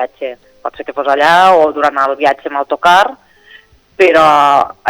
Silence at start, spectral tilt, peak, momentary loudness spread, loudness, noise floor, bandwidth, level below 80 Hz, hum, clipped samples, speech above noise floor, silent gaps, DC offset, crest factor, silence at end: 0 s; -3.5 dB/octave; 0 dBFS; 17 LU; -10 LUFS; -43 dBFS; over 20 kHz; -52 dBFS; none; under 0.1%; 32 dB; none; under 0.1%; 10 dB; 0 s